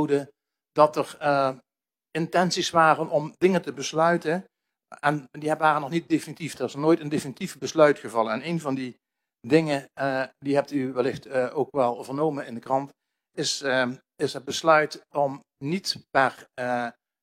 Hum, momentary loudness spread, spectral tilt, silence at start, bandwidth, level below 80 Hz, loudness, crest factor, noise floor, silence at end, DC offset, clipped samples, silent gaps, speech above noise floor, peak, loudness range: none; 11 LU; -5 dB/octave; 0 s; 16 kHz; -72 dBFS; -25 LUFS; 22 dB; under -90 dBFS; 0.3 s; under 0.1%; under 0.1%; none; over 65 dB; -4 dBFS; 3 LU